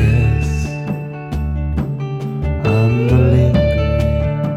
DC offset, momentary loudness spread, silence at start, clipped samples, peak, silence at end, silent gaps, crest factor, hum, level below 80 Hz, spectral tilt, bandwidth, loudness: under 0.1%; 11 LU; 0 s; under 0.1%; -2 dBFS; 0 s; none; 12 dB; none; -22 dBFS; -8.5 dB/octave; 8.6 kHz; -17 LUFS